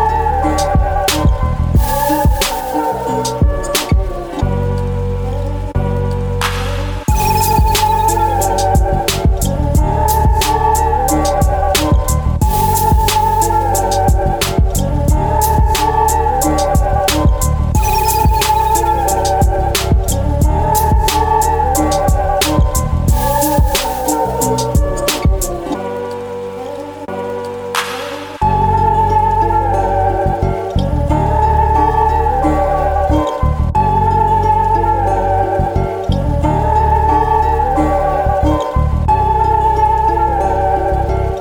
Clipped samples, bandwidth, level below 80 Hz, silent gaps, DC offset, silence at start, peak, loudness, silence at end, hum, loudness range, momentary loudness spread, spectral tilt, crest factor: under 0.1%; over 20 kHz; -18 dBFS; none; under 0.1%; 0 s; -2 dBFS; -14 LUFS; 0 s; none; 4 LU; 6 LU; -5 dB/octave; 12 dB